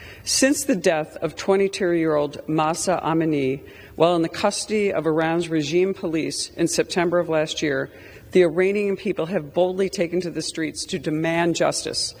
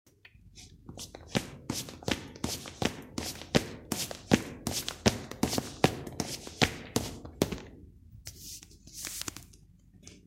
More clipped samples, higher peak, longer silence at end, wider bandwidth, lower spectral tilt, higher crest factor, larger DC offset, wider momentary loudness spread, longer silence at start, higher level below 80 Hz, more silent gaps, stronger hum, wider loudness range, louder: neither; first, -2 dBFS vs -6 dBFS; about the same, 0 s vs 0.05 s; first, over 20 kHz vs 16.5 kHz; about the same, -4 dB/octave vs -4 dB/octave; second, 20 dB vs 30 dB; neither; second, 7 LU vs 20 LU; second, 0 s vs 0.45 s; about the same, -54 dBFS vs -52 dBFS; neither; neither; second, 1 LU vs 6 LU; first, -22 LUFS vs -33 LUFS